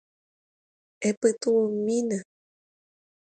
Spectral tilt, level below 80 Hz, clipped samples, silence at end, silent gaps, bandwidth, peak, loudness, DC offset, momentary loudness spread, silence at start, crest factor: -5 dB/octave; -74 dBFS; under 0.1%; 1 s; 1.17-1.21 s; 9.2 kHz; -10 dBFS; -26 LUFS; under 0.1%; 7 LU; 1 s; 20 dB